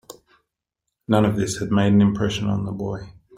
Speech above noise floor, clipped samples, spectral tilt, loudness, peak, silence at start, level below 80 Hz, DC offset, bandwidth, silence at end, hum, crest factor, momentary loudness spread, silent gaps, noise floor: 61 dB; under 0.1%; -6.5 dB/octave; -21 LUFS; -4 dBFS; 0.1 s; -48 dBFS; under 0.1%; 12 kHz; 0.25 s; none; 18 dB; 13 LU; none; -81 dBFS